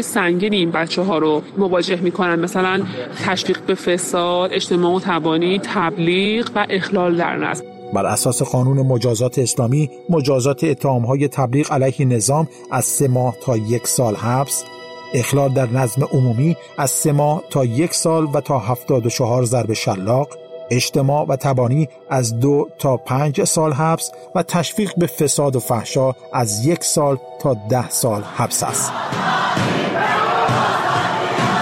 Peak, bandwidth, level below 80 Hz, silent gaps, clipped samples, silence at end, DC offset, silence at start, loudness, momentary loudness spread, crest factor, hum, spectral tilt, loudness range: -6 dBFS; 16 kHz; -54 dBFS; none; under 0.1%; 0 s; under 0.1%; 0 s; -18 LUFS; 4 LU; 12 dB; none; -5 dB/octave; 1 LU